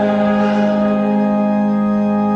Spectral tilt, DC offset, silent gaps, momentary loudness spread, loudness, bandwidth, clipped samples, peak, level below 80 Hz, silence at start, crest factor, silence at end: -8.5 dB/octave; under 0.1%; none; 1 LU; -15 LUFS; 6.6 kHz; under 0.1%; -4 dBFS; -50 dBFS; 0 s; 10 dB; 0 s